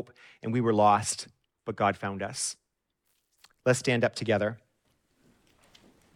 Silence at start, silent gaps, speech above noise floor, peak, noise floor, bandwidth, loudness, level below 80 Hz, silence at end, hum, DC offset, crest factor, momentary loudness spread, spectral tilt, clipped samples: 0 s; none; 50 dB; -10 dBFS; -78 dBFS; 15.5 kHz; -28 LUFS; -70 dBFS; 1.6 s; none; under 0.1%; 20 dB; 20 LU; -4.5 dB/octave; under 0.1%